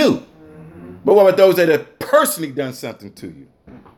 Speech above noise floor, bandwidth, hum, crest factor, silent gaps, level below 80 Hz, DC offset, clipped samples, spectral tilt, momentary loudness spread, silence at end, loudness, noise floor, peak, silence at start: 25 dB; 17 kHz; none; 16 dB; none; -60 dBFS; under 0.1%; under 0.1%; -4.5 dB/octave; 23 LU; 0.2 s; -15 LUFS; -41 dBFS; 0 dBFS; 0 s